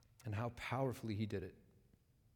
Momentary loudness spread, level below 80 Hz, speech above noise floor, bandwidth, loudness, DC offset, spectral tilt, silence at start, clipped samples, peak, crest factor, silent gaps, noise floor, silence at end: 6 LU; -70 dBFS; 29 dB; 19 kHz; -43 LUFS; under 0.1%; -7 dB/octave; 0.2 s; under 0.1%; -26 dBFS; 18 dB; none; -72 dBFS; 0.75 s